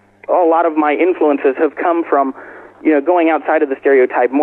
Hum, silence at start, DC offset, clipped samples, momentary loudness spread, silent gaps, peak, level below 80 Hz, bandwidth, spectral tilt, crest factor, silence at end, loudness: none; 0.3 s; under 0.1%; under 0.1%; 5 LU; none; -2 dBFS; -68 dBFS; 4 kHz; -7 dB/octave; 10 dB; 0 s; -14 LUFS